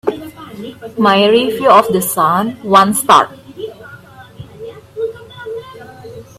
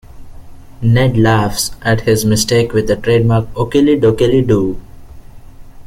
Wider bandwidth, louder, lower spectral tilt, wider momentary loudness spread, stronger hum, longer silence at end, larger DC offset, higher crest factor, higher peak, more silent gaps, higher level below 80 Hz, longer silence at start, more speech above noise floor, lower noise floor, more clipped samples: about the same, 16 kHz vs 16 kHz; about the same, -12 LUFS vs -13 LUFS; second, -4 dB/octave vs -5.5 dB/octave; first, 22 LU vs 6 LU; neither; about the same, 0.15 s vs 0.05 s; neither; about the same, 14 dB vs 12 dB; about the same, 0 dBFS vs 0 dBFS; neither; second, -54 dBFS vs -32 dBFS; about the same, 0.05 s vs 0.1 s; first, 25 dB vs 21 dB; first, -37 dBFS vs -33 dBFS; neither